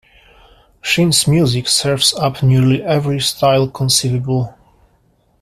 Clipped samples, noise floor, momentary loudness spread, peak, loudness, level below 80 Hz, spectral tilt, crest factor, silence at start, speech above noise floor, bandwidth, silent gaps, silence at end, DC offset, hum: under 0.1%; -57 dBFS; 6 LU; 0 dBFS; -14 LUFS; -46 dBFS; -4.5 dB/octave; 16 dB; 0.85 s; 43 dB; 15.5 kHz; none; 0.9 s; under 0.1%; none